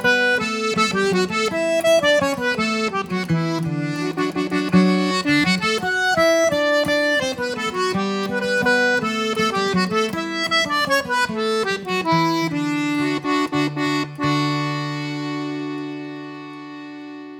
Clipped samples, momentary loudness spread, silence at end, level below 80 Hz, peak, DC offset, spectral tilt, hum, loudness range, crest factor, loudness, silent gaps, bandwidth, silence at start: under 0.1%; 9 LU; 0 s; -56 dBFS; -4 dBFS; under 0.1%; -4.5 dB/octave; none; 4 LU; 16 dB; -20 LUFS; none; 19 kHz; 0 s